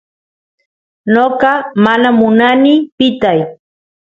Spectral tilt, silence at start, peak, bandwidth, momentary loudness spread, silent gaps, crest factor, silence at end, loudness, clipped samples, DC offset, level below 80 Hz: -7 dB/octave; 1.05 s; 0 dBFS; 7.2 kHz; 6 LU; 2.92-2.98 s; 12 dB; 0.5 s; -11 LUFS; under 0.1%; under 0.1%; -52 dBFS